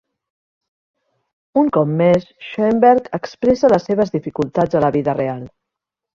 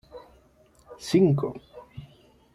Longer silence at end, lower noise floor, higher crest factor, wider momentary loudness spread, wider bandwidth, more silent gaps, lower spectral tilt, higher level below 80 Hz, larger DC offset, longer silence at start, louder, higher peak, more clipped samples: first, 0.65 s vs 0.5 s; first, -83 dBFS vs -59 dBFS; about the same, 16 dB vs 18 dB; second, 8 LU vs 26 LU; second, 7.4 kHz vs 13 kHz; neither; about the same, -8 dB/octave vs -7.5 dB/octave; first, -52 dBFS vs -60 dBFS; neither; first, 1.55 s vs 0.15 s; first, -16 LUFS vs -24 LUFS; first, 0 dBFS vs -10 dBFS; neither